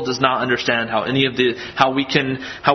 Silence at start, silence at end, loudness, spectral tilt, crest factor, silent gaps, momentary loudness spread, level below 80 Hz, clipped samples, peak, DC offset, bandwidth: 0 s; 0 s; -18 LUFS; -5 dB/octave; 18 dB; none; 3 LU; -52 dBFS; under 0.1%; 0 dBFS; under 0.1%; 6.4 kHz